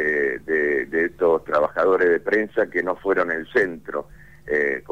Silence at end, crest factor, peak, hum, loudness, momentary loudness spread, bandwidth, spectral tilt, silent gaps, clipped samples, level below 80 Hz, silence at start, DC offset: 0 s; 12 dB; -8 dBFS; none; -21 LUFS; 6 LU; 8.8 kHz; -6.5 dB/octave; none; under 0.1%; -54 dBFS; 0 s; 0.3%